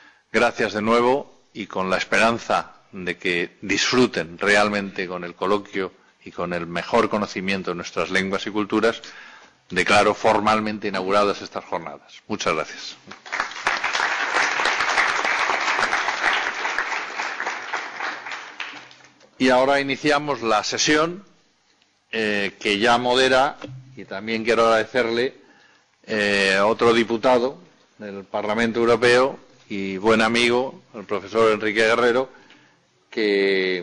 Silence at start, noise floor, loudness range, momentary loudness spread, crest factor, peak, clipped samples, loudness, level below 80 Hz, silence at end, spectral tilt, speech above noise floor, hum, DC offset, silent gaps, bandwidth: 0.35 s; -62 dBFS; 4 LU; 15 LU; 14 dB; -8 dBFS; under 0.1%; -21 LUFS; -56 dBFS; 0 s; -3.5 dB/octave; 41 dB; none; under 0.1%; none; 10 kHz